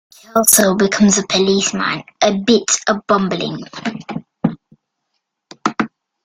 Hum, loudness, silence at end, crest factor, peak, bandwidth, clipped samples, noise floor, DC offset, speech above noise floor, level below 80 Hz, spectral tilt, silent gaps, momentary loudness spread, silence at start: none; -16 LUFS; 0.35 s; 18 dB; 0 dBFS; 16.5 kHz; under 0.1%; -73 dBFS; under 0.1%; 58 dB; -54 dBFS; -3 dB/octave; none; 14 LU; 0.35 s